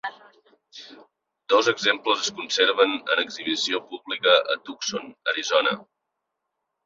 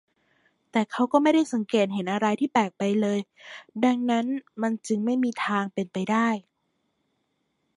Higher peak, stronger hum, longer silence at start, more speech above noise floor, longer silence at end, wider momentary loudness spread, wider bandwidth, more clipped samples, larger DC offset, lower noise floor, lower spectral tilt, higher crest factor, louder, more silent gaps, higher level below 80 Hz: about the same, -4 dBFS vs -6 dBFS; neither; second, 0.05 s vs 0.75 s; first, 58 dB vs 50 dB; second, 1 s vs 1.35 s; first, 13 LU vs 8 LU; second, 7.8 kHz vs 11 kHz; neither; neither; first, -81 dBFS vs -75 dBFS; second, -1.5 dB/octave vs -5.5 dB/octave; about the same, 20 dB vs 20 dB; about the same, -23 LUFS vs -25 LUFS; neither; about the same, -74 dBFS vs -76 dBFS